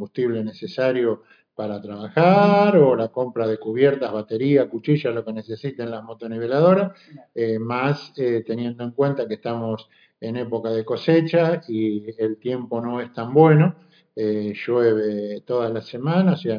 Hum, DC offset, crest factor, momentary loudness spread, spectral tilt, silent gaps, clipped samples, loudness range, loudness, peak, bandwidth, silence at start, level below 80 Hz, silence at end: none; under 0.1%; 18 dB; 15 LU; -9 dB/octave; none; under 0.1%; 6 LU; -21 LUFS; -2 dBFS; 5.2 kHz; 0 s; -78 dBFS; 0 s